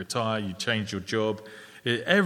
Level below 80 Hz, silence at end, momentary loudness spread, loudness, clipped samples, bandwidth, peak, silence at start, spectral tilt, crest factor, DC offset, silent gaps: -66 dBFS; 0 s; 8 LU; -29 LUFS; under 0.1%; 16 kHz; -6 dBFS; 0 s; -4.5 dB/octave; 22 dB; under 0.1%; none